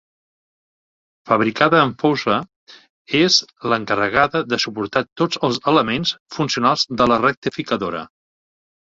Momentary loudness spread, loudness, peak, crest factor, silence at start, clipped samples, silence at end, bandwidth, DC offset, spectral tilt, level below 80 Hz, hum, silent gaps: 8 LU; -18 LUFS; 0 dBFS; 20 dB; 1.25 s; under 0.1%; 0.85 s; 7.8 kHz; under 0.1%; -4 dB/octave; -54 dBFS; none; 2.56-2.67 s, 2.90-3.05 s, 5.12-5.16 s, 6.20-6.26 s, 7.37-7.42 s